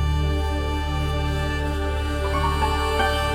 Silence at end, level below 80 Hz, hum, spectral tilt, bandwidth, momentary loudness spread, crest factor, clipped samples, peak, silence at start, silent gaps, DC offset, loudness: 0 s; -26 dBFS; none; -5.5 dB/octave; 15 kHz; 4 LU; 14 dB; under 0.1%; -10 dBFS; 0 s; none; under 0.1%; -24 LUFS